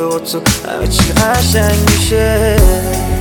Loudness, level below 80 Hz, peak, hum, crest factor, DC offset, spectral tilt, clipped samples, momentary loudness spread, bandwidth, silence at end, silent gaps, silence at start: -12 LUFS; -18 dBFS; 0 dBFS; none; 12 dB; under 0.1%; -4.5 dB/octave; under 0.1%; 5 LU; over 20 kHz; 0 s; none; 0 s